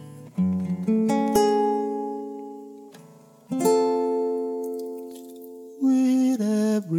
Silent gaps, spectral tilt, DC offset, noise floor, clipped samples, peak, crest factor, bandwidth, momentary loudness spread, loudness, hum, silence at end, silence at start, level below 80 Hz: none; -6.5 dB/octave; under 0.1%; -50 dBFS; under 0.1%; -8 dBFS; 16 dB; 19 kHz; 20 LU; -24 LUFS; none; 0 s; 0 s; -64 dBFS